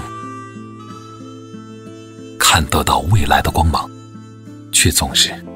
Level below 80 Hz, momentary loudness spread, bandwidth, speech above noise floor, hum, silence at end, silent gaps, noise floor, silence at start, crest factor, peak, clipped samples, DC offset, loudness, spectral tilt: -30 dBFS; 23 LU; 16.5 kHz; 21 dB; none; 0 s; none; -36 dBFS; 0 s; 18 dB; 0 dBFS; under 0.1%; under 0.1%; -14 LUFS; -3 dB/octave